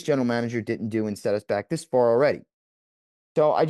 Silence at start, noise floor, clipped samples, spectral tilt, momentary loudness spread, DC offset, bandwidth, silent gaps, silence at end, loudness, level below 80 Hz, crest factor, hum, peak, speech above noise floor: 0 s; under -90 dBFS; under 0.1%; -6.5 dB/octave; 8 LU; under 0.1%; 12.5 kHz; 2.54-3.35 s; 0 s; -25 LUFS; -72 dBFS; 14 dB; none; -10 dBFS; over 67 dB